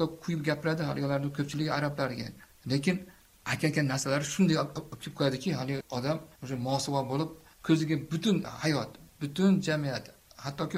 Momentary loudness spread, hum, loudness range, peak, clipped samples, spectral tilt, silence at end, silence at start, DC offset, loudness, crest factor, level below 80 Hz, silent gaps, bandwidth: 13 LU; none; 2 LU; -12 dBFS; under 0.1%; -5.5 dB/octave; 0 s; 0 s; under 0.1%; -31 LUFS; 20 dB; -62 dBFS; none; 16 kHz